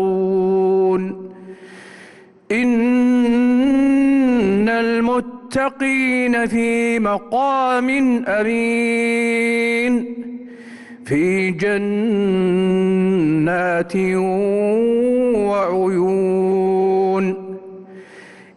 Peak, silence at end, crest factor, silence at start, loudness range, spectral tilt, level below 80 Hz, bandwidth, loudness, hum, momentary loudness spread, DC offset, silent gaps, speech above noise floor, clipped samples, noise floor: -8 dBFS; 0.25 s; 8 dB; 0 s; 3 LU; -6.5 dB/octave; -52 dBFS; 11.5 kHz; -17 LUFS; none; 13 LU; under 0.1%; none; 27 dB; under 0.1%; -44 dBFS